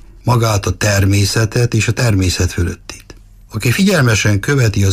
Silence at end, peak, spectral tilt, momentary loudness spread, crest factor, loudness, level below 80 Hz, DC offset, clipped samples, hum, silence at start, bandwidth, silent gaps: 0 s; -2 dBFS; -5 dB/octave; 8 LU; 12 dB; -14 LUFS; -32 dBFS; under 0.1%; under 0.1%; none; 0.25 s; 15.5 kHz; none